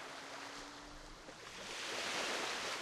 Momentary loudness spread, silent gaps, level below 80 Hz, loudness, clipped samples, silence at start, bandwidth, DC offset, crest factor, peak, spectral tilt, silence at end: 15 LU; none; -66 dBFS; -42 LUFS; under 0.1%; 0 s; 15 kHz; under 0.1%; 18 dB; -26 dBFS; -1 dB/octave; 0 s